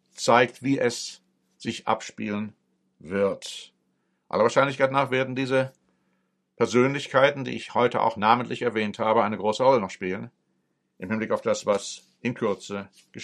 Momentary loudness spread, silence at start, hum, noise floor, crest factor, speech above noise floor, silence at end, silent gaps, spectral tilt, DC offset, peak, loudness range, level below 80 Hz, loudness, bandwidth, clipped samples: 14 LU; 0.15 s; none; -73 dBFS; 22 dB; 49 dB; 0 s; none; -5 dB/octave; under 0.1%; -4 dBFS; 6 LU; -70 dBFS; -25 LUFS; 12.5 kHz; under 0.1%